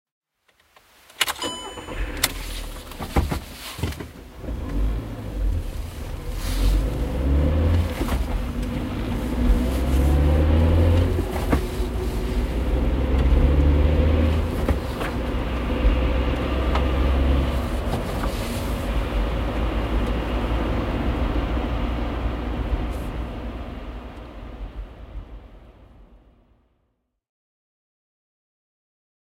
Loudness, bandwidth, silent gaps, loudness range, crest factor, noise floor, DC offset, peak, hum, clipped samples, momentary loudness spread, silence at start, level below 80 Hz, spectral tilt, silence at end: -24 LUFS; 16 kHz; none; 10 LU; 22 dB; -72 dBFS; under 0.1%; 0 dBFS; none; under 0.1%; 15 LU; 1.2 s; -26 dBFS; -6 dB/octave; 3.1 s